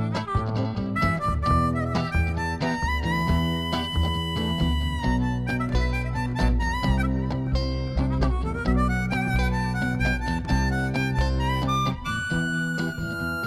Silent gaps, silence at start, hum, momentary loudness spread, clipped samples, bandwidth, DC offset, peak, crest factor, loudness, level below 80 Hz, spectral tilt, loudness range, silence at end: none; 0 s; none; 3 LU; under 0.1%; 14 kHz; under 0.1%; -10 dBFS; 14 dB; -25 LUFS; -30 dBFS; -6 dB/octave; 1 LU; 0 s